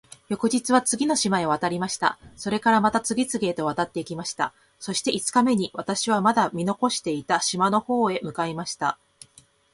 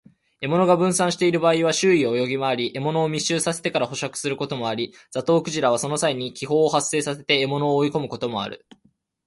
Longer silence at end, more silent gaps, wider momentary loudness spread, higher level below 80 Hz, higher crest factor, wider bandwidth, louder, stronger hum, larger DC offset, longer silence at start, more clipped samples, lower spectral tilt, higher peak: about the same, 0.8 s vs 0.7 s; neither; about the same, 8 LU vs 9 LU; about the same, -62 dBFS vs -64 dBFS; about the same, 20 dB vs 18 dB; about the same, 11.5 kHz vs 11.5 kHz; about the same, -24 LUFS vs -22 LUFS; neither; neither; about the same, 0.3 s vs 0.4 s; neither; about the same, -3.5 dB/octave vs -4 dB/octave; about the same, -4 dBFS vs -4 dBFS